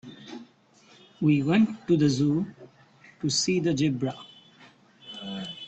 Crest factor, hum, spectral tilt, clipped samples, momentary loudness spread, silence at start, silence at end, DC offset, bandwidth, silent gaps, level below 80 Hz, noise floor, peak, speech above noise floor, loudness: 16 dB; none; -5.5 dB/octave; under 0.1%; 21 LU; 0.05 s; 0 s; under 0.1%; 8.8 kHz; none; -64 dBFS; -58 dBFS; -12 dBFS; 34 dB; -26 LUFS